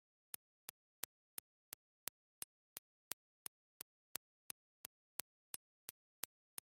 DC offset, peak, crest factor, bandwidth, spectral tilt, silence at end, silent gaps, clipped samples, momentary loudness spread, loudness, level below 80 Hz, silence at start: under 0.1%; -14 dBFS; 44 dB; 16 kHz; 0.5 dB/octave; 0.9 s; 2.78-5.88 s; under 0.1%; 7 LU; -54 LUFS; under -90 dBFS; 2.75 s